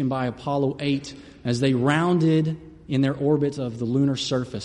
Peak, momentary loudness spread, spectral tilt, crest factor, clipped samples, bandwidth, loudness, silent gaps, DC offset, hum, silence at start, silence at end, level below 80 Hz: -8 dBFS; 9 LU; -6.5 dB/octave; 14 dB; under 0.1%; 11 kHz; -23 LUFS; none; under 0.1%; none; 0 s; 0 s; -56 dBFS